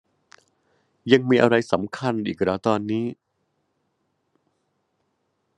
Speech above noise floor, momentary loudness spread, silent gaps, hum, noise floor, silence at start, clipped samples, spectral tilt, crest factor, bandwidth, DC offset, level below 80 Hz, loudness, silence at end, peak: 52 dB; 10 LU; none; none; -73 dBFS; 1.05 s; under 0.1%; -6.5 dB/octave; 24 dB; 10.5 kHz; under 0.1%; -68 dBFS; -22 LUFS; 2.45 s; -2 dBFS